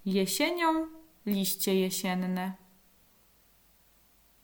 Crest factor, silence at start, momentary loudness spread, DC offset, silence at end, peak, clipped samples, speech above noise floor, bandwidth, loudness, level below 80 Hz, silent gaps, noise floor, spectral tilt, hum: 18 dB; 0.05 s; 13 LU; under 0.1%; 1.85 s; -14 dBFS; under 0.1%; 34 dB; over 20 kHz; -30 LUFS; -68 dBFS; none; -63 dBFS; -4 dB/octave; none